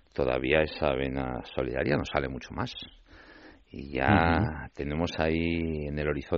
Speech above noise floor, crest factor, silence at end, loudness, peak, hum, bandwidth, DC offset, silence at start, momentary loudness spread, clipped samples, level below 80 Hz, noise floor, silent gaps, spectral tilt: 24 dB; 22 dB; 0 s; -29 LUFS; -8 dBFS; none; 7.2 kHz; under 0.1%; 0.15 s; 12 LU; under 0.1%; -44 dBFS; -53 dBFS; none; -5 dB/octave